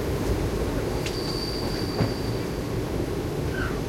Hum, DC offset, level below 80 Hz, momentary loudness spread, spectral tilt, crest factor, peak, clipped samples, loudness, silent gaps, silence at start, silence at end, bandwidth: none; under 0.1%; -36 dBFS; 2 LU; -6 dB/octave; 18 dB; -10 dBFS; under 0.1%; -28 LUFS; none; 0 s; 0 s; 16.5 kHz